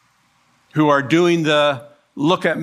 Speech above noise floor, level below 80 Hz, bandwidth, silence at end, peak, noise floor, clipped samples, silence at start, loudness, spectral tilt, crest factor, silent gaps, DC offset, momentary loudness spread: 43 dB; -66 dBFS; 12.5 kHz; 0 s; -2 dBFS; -59 dBFS; under 0.1%; 0.75 s; -17 LUFS; -5.5 dB/octave; 16 dB; none; under 0.1%; 9 LU